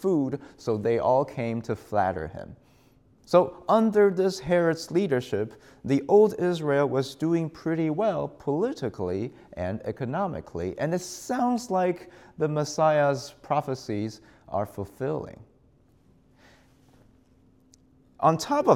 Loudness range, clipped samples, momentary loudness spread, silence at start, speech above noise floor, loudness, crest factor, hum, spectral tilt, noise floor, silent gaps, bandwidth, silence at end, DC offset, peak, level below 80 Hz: 10 LU; under 0.1%; 12 LU; 0 s; 35 dB; -26 LUFS; 22 dB; none; -6.5 dB/octave; -61 dBFS; none; 15.5 kHz; 0 s; under 0.1%; -6 dBFS; -60 dBFS